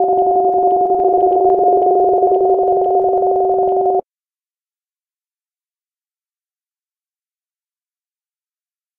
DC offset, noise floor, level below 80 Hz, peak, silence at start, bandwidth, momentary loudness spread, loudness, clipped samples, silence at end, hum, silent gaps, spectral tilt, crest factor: under 0.1%; under -90 dBFS; -54 dBFS; -2 dBFS; 0 s; 1.6 kHz; 2 LU; -14 LUFS; under 0.1%; 5 s; none; none; -10.5 dB/octave; 14 dB